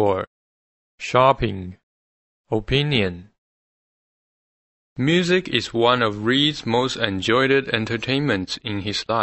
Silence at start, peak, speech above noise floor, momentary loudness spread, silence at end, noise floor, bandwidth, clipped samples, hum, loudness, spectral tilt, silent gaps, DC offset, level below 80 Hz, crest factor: 0 s; -2 dBFS; over 70 dB; 10 LU; 0 s; under -90 dBFS; 8.4 kHz; under 0.1%; none; -20 LUFS; -5 dB/octave; 0.27-0.98 s, 1.83-2.44 s, 3.38-4.96 s; under 0.1%; -46 dBFS; 22 dB